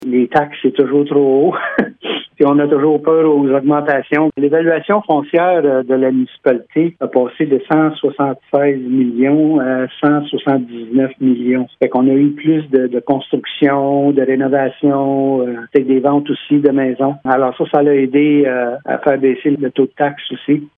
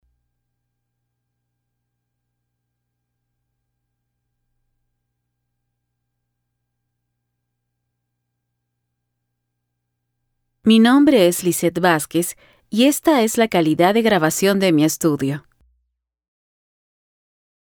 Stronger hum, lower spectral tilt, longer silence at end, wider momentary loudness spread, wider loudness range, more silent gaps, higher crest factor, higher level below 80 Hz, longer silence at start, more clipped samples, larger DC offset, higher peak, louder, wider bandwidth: second, none vs 60 Hz at -50 dBFS; first, -9.5 dB/octave vs -4.5 dB/octave; second, 0.1 s vs 2.25 s; second, 5 LU vs 10 LU; second, 2 LU vs 5 LU; neither; second, 14 dB vs 20 dB; about the same, -62 dBFS vs -62 dBFS; second, 0 s vs 10.65 s; neither; neither; about the same, 0 dBFS vs -2 dBFS; about the same, -14 LUFS vs -16 LUFS; second, 3.8 kHz vs over 20 kHz